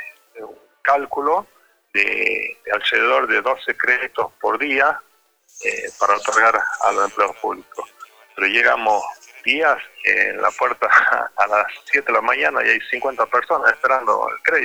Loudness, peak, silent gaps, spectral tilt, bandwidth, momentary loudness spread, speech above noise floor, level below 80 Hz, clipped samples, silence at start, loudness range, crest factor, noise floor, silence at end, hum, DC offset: -18 LUFS; -2 dBFS; none; -1.5 dB/octave; over 20 kHz; 10 LU; 20 dB; -62 dBFS; under 0.1%; 0 s; 3 LU; 18 dB; -38 dBFS; 0 s; none; under 0.1%